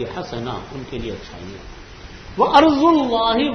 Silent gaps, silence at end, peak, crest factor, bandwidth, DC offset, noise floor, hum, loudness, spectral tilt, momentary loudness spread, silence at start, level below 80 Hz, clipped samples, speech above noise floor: none; 0 s; 0 dBFS; 20 dB; 6.6 kHz; under 0.1%; -37 dBFS; none; -17 LUFS; -6 dB/octave; 25 LU; 0 s; -42 dBFS; under 0.1%; 19 dB